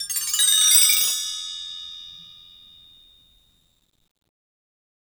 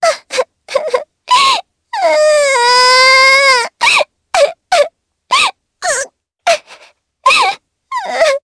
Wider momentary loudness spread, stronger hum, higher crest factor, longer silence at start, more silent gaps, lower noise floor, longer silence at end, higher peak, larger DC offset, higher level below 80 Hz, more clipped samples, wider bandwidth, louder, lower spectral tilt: first, 23 LU vs 14 LU; neither; first, 22 dB vs 12 dB; about the same, 0 s vs 0 s; neither; first, -63 dBFS vs -46 dBFS; first, 2.8 s vs 0.05 s; about the same, -2 dBFS vs 0 dBFS; neither; second, -68 dBFS vs -56 dBFS; neither; first, over 20 kHz vs 11 kHz; second, -16 LUFS vs -11 LUFS; second, 5 dB/octave vs 1.5 dB/octave